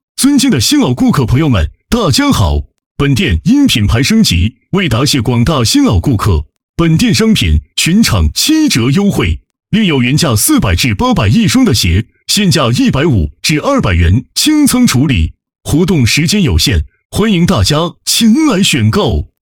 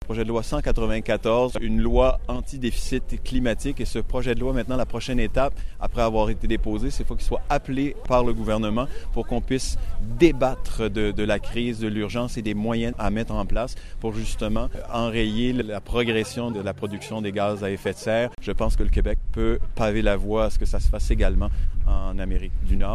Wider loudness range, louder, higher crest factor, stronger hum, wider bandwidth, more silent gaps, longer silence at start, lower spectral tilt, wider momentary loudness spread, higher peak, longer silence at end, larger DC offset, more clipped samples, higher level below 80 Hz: about the same, 1 LU vs 2 LU; first, -10 LUFS vs -26 LUFS; second, 10 dB vs 18 dB; neither; first, 19.5 kHz vs 12 kHz; first, 2.86-2.95 s, 6.63-6.74 s, 17.05-17.10 s vs none; first, 0.2 s vs 0 s; second, -4.5 dB/octave vs -6 dB/octave; about the same, 6 LU vs 7 LU; first, 0 dBFS vs -4 dBFS; first, 0.15 s vs 0 s; first, 0.2% vs under 0.1%; neither; about the same, -24 dBFS vs -26 dBFS